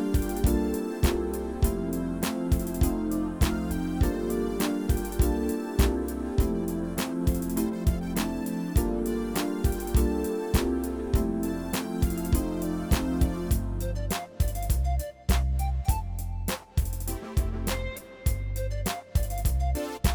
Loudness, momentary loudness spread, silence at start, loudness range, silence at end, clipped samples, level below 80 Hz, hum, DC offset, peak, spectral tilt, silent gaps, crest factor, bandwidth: -29 LUFS; 5 LU; 0 s; 3 LU; 0 s; under 0.1%; -30 dBFS; none; under 0.1%; -10 dBFS; -6 dB/octave; none; 18 dB; over 20 kHz